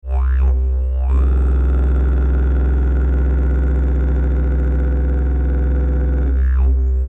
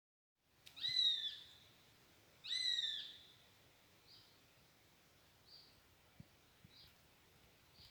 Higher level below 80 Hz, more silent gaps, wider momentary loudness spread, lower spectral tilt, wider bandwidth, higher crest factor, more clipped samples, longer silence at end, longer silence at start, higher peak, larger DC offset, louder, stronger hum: first, -14 dBFS vs -84 dBFS; neither; second, 2 LU vs 29 LU; first, -10.5 dB/octave vs 0.5 dB/octave; second, 2.6 kHz vs over 20 kHz; second, 8 dB vs 22 dB; neither; about the same, 0 s vs 0 s; second, 0.05 s vs 0.65 s; first, -8 dBFS vs -26 dBFS; neither; first, -18 LUFS vs -38 LUFS; neither